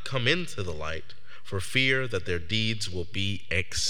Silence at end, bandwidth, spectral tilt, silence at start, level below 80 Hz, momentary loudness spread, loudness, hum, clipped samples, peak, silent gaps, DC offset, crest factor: 0 s; 17 kHz; -3.5 dB/octave; 0 s; -52 dBFS; 12 LU; -28 LUFS; none; under 0.1%; -8 dBFS; none; 3%; 22 dB